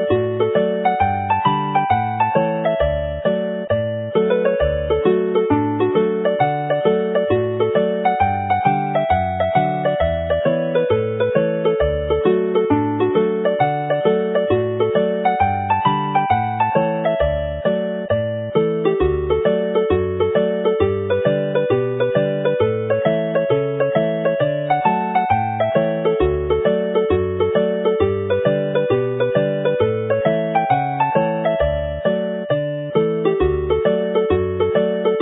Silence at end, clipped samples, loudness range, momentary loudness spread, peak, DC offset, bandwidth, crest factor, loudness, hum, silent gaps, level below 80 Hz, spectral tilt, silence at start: 0 s; under 0.1%; 1 LU; 2 LU; -2 dBFS; under 0.1%; 4 kHz; 16 dB; -18 LUFS; none; none; -36 dBFS; -12 dB/octave; 0 s